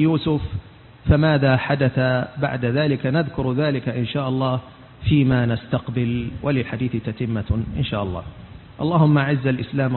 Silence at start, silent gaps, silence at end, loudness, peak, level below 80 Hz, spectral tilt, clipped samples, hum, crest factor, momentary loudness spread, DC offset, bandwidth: 0 s; none; 0 s; -21 LUFS; -6 dBFS; -38 dBFS; -12.5 dB/octave; under 0.1%; none; 16 dB; 11 LU; under 0.1%; 4.3 kHz